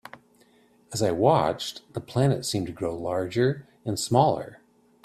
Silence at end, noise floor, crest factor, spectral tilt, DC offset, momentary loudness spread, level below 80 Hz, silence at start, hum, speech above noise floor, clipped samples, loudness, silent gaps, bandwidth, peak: 0.5 s; -60 dBFS; 22 dB; -5.5 dB/octave; under 0.1%; 12 LU; -58 dBFS; 0.15 s; none; 35 dB; under 0.1%; -26 LUFS; none; 14 kHz; -4 dBFS